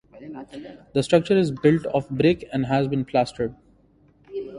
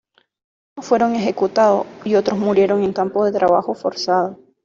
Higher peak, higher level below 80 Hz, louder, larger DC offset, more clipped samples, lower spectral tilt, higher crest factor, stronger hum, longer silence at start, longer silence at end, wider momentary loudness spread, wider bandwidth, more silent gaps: about the same, -4 dBFS vs -4 dBFS; about the same, -54 dBFS vs -58 dBFS; second, -22 LUFS vs -18 LUFS; neither; neither; about the same, -7 dB/octave vs -6 dB/octave; first, 20 dB vs 14 dB; neither; second, 0.15 s vs 0.75 s; second, 0 s vs 0.3 s; first, 19 LU vs 6 LU; first, 11.5 kHz vs 7.4 kHz; neither